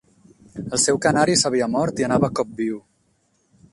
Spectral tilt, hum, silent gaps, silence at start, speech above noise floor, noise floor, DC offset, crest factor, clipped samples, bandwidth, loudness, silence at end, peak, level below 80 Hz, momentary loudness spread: -3.5 dB/octave; none; none; 0.55 s; 45 dB; -65 dBFS; under 0.1%; 20 dB; under 0.1%; 11.5 kHz; -20 LUFS; 0.95 s; -4 dBFS; -54 dBFS; 14 LU